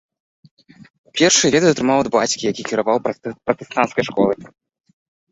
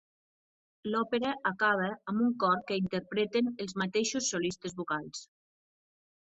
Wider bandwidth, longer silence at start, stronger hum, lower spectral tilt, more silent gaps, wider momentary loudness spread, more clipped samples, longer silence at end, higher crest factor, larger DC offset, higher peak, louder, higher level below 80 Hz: about the same, 8.4 kHz vs 8.4 kHz; about the same, 0.8 s vs 0.85 s; neither; about the same, -3 dB/octave vs -4 dB/octave; first, 0.90-1.04 s vs none; first, 12 LU vs 8 LU; neither; about the same, 0.85 s vs 0.95 s; about the same, 18 dB vs 18 dB; neither; first, -2 dBFS vs -14 dBFS; first, -18 LUFS vs -31 LUFS; first, -56 dBFS vs -72 dBFS